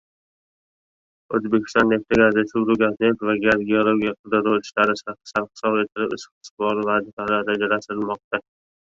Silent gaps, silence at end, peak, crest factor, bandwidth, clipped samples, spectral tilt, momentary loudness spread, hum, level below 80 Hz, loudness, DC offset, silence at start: 4.19-4.24 s, 6.32-6.41 s, 6.51-6.57 s, 7.13-7.17 s, 8.24-8.31 s; 0.5 s; -2 dBFS; 20 dB; 7.6 kHz; under 0.1%; -6 dB/octave; 9 LU; none; -56 dBFS; -21 LUFS; under 0.1%; 1.3 s